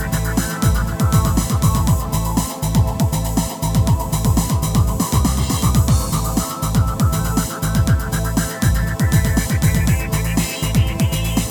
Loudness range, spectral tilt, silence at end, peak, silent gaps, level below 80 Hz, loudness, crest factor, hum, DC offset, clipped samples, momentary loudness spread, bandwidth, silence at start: 1 LU; -5 dB/octave; 0 s; 0 dBFS; none; -22 dBFS; -18 LUFS; 16 dB; none; under 0.1%; under 0.1%; 4 LU; over 20 kHz; 0 s